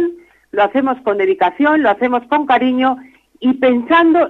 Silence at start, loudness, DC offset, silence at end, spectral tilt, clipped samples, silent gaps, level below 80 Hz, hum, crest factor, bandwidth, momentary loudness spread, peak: 0 s; -15 LUFS; under 0.1%; 0 s; -6.5 dB/octave; under 0.1%; none; -56 dBFS; none; 12 dB; 4.3 kHz; 7 LU; -2 dBFS